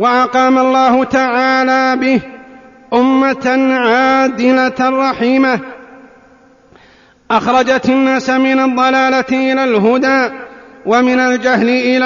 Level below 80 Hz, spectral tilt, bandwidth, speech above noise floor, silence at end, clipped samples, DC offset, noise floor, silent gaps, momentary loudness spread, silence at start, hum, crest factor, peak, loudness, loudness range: -52 dBFS; -2.5 dB/octave; 7.4 kHz; 35 dB; 0 s; under 0.1%; under 0.1%; -46 dBFS; none; 4 LU; 0 s; none; 12 dB; 0 dBFS; -12 LUFS; 3 LU